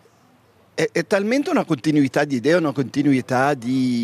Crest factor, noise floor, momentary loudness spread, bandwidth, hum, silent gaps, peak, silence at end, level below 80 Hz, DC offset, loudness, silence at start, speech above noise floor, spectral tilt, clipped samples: 16 dB; -55 dBFS; 4 LU; 14 kHz; none; none; -4 dBFS; 0 s; -66 dBFS; under 0.1%; -20 LUFS; 0.75 s; 36 dB; -6 dB/octave; under 0.1%